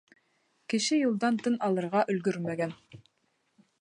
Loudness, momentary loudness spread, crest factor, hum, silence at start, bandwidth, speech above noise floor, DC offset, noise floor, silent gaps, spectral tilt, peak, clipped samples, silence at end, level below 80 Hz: -29 LUFS; 9 LU; 18 dB; none; 0.7 s; 11 kHz; 46 dB; under 0.1%; -75 dBFS; none; -5 dB/octave; -14 dBFS; under 0.1%; 0.85 s; -78 dBFS